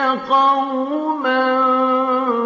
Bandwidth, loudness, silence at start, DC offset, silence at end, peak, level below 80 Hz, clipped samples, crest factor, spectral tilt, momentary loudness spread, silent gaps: 7.2 kHz; -17 LUFS; 0 s; under 0.1%; 0 s; -4 dBFS; -70 dBFS; under 0.1%; 12 dB; -5 dB/octave; 6 LU; none